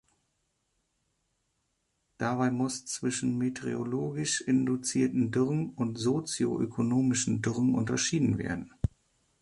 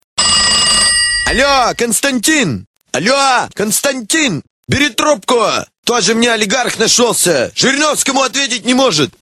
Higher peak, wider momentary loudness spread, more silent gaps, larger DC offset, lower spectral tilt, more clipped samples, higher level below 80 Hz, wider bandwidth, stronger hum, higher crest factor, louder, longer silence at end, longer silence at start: second, -14 dBFS vs 0 dBFS; about the same, 6 LU vs 7 LU; second, none vs 2.67-2.74 s, 4.50-4.63 s, 5.78-5.83 s; second, under 0.1% vs 0.1%; first, -5 dB/octave vs -2 dB/octave; neither; second, -54 dBFS vs -38 dBFS; second, 11.5 kHz vs 16 kHz; neither; about the same, 16 dB vs 12 dB; second, -30 LUFS vs -11 LUFS; first, 0.55 s vs 0.1 s; first, 2.2 s vs 0.15 s